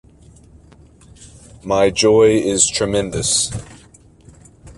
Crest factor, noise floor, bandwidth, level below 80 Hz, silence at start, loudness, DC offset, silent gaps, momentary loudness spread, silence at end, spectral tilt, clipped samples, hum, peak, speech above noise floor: 18 dB; -47 dBFS; 11.5 kHz; -42 dBFS; 1.2 s; -15 LUFS; under 0.1%; none; 10 LU; 0.05 s; -3 dB/octave; under 0.1%; none; -2 dBFS; 31 dB